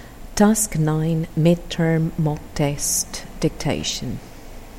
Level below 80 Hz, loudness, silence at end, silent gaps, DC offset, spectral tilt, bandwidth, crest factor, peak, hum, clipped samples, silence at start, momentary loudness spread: -38 dBFS; -21 LUFS; 0 s; none; under 0.1%; -5 dB/octave; 16.5 kHz; 18 dB; -2 dBFS; none; under 0.1%; 0 s; 13 LU